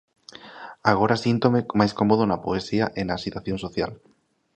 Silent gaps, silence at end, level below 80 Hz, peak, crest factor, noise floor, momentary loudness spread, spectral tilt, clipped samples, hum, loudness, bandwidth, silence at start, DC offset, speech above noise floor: none; 0.6 s; -52 dBFS; -2 dBFS; 22 dB; -43 dBFS; 14 LU; -7 dB/octave; under 0.1%; none; -23 LUFS; 9 kHz; 0.45 s; under 0.1%; 20 dB